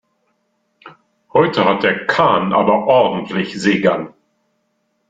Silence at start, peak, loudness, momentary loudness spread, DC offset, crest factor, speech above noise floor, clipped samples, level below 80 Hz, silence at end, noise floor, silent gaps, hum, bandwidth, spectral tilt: 0.85 s; -2 dBFS; -15 LUFS; 8 LU; under 0.1%; 16 dB; 52 dB; under 0.1%; -56 dBFS; 1 s; -67 dBFS; none; none; 9.2 kHz; -6 dB/octave